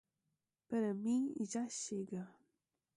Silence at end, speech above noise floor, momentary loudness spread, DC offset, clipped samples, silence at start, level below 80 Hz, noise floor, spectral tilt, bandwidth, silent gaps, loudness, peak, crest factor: 0.65 s; 49 dB; 10 LU; under 0.1%; under 0.1%; 0.7 s; -84 dBFS; -88 dBFS; -5 dB/octave; 11.5 kHz; none; -40 LUFS; -28 dBFS; 14 dB